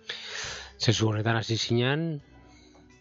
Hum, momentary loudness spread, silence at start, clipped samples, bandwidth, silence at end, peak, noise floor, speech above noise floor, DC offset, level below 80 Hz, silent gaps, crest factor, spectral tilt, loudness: none; 10 LU; 0.05 s; under 0.1%; 7.8 kHz; 0.6 s; -6 dBFS; -54 dBFS; 28 dB; under 0.1%; -58 dBFS; none; 22 dB; -5 dB/octave; -28 LUFS